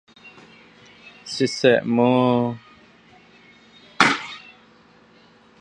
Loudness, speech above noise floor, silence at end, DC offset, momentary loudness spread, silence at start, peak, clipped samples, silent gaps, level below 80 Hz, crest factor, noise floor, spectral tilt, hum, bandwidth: -19 LUFS; 34 dB; 1.2 s; under 0.1%; 20 LU; 0.25 s; 0 dBFS; under 0.1%; none; -66 dBFS; 24 dB; -53 dBFS; -5 dB/octave; none; 10.5 kHz